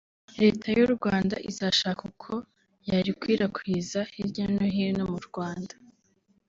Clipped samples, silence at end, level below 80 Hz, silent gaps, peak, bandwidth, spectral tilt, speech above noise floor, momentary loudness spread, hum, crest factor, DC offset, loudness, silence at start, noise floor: under 0.1%; 0.8 s; -58 dBFS; none; -8 dBFS; 7.8 kHz; -5.5 dB/octave; 41 dB; 12 LU; none; 20 dB; under 0.1%; -27 LUFS; 0.3 s; -68 dBFS